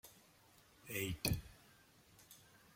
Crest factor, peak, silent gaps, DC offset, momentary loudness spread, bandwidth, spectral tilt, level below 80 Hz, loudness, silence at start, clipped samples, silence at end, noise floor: 32 dB; -14 dBFS; none; under 0.1%; 26 LU; 16.5 kHz; -4 dB/octave; -60 dBFS; -42 LUFS; 0.05 s; under 0.1%; 0.35 s; -68 dBFS